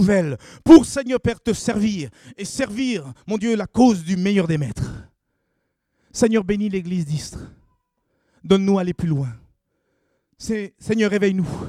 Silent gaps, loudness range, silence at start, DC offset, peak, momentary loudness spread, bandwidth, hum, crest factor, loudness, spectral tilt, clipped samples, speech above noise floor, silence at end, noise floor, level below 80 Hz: none; 6 LU; 0 s; under 0.1%; 0 dBFS; 13 LU; 12.5 kHz; none; 20 dB; -20 LUFS; -6 dB/octave; under 0.1%; 54 dB; 0 s; -73 dBFS; -46 dBFS